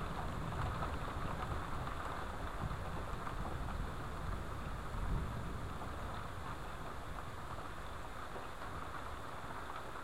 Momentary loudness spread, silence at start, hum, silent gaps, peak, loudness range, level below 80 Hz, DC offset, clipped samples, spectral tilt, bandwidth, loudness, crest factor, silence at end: 5 LU; 0 s; none; none; -26 dBFS; 4 LU; -48 dBFS; 0.4%; under 0.1%; -6 dB/octave; 16 kHz; -44 LUFS; 18 dB; 0 s